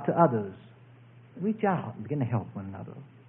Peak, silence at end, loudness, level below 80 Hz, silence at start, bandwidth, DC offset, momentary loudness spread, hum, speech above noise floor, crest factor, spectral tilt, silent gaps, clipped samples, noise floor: -8 dBFS; 0.2 s; -30 LUFS; -72 dBFS; 0 s; 3.6 kHz; under 0.1%; 20 LU; none; 24 dB; 22 dB; -12.5 dB/octave; none; under 0.1%; -53 dBFS